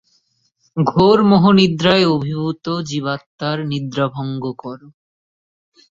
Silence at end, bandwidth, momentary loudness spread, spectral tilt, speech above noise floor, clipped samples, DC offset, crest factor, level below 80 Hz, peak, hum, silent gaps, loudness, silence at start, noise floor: 1.05 s; 7.8 kHz; 15 LU; -6.5 dB/octave; 47 dB; under 0.1%; under 0.1%; 16 dB; -52 dBFS; -2 dBFS; none; 3.26-3.39 s; -16 LUFS; 0.75 s; -63 dBFS